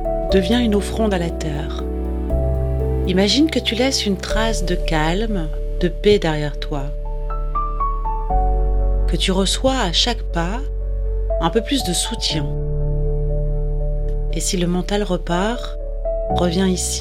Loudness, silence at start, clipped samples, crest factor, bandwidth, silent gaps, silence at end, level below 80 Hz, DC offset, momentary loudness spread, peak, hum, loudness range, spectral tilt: -20 LUFS; 0 s; under 0.1%; 18 dB; 14 kHz; none; 0 s; -22 dBFS; under 0.1%; 9 LU; -2 dBFS; none; 3 LU; -4.5 dB/octave